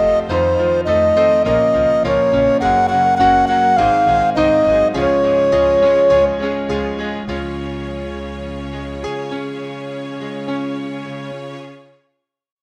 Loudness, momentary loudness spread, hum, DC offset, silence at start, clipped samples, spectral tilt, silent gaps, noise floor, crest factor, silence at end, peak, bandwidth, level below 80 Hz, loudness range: -16 LUFS; 14 LU; none; under 0.1%; 0 s; under 0.1%; -6.5 dB/octave; none; -70 dBFS; 14 dB; 0.85 s; -2 dBFS; 9.4 kHz; -36 dBFS; 12 LU